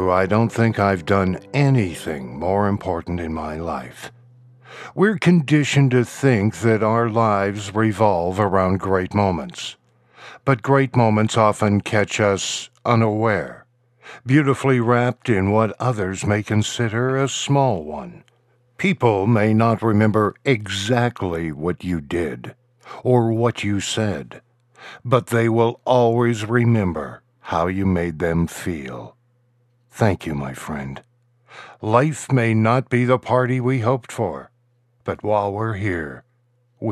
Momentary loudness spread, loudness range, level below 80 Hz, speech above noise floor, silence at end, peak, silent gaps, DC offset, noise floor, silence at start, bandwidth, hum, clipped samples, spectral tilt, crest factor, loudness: 13 LU; 5 LU; -50 dBFS; 43 dB; 0 s; -2 dBFS; none; under 0.1%; -63 dBFS; 0 s; 13 kHz; none; under 0.1%; -6.5 dB/octave; 18 dB; -20 LUFS